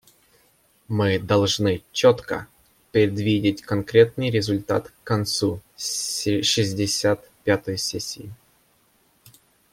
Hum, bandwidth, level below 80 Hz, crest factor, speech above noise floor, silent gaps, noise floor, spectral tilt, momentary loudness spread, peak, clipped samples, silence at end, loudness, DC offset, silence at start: none; 16.5 kHz; -56 dBFS; 20 dB; 40 dB; none; -62 dBFS; -4.5 dB/octave; 9 LU; -2 dBFS; under 0.1%; 1.4 s; -22 LUFS; under 0.1%; 0.9 s